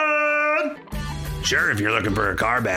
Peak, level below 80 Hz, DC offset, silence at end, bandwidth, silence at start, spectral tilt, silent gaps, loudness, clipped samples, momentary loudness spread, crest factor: -4 dBFS; -38 dBFS; under 0.1%; 0 s; 17.5 kHz; 0 s; -4 dB/octave; none; -21 LUFS; under 0.1%; 11 LU; 18 dB